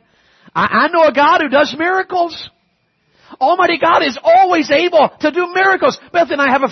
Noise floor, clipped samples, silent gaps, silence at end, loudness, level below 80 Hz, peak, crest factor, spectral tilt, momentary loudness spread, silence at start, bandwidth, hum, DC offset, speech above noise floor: -62 dBFS; under 0.1%; none; 0 s; -13 LUFS; -58 dBFS; 0 dBFS; 12 dB; -4.5 dB/octave; 7 LU; 0.55 s; 6.4 kHz; none; under 0.1%; 49 dB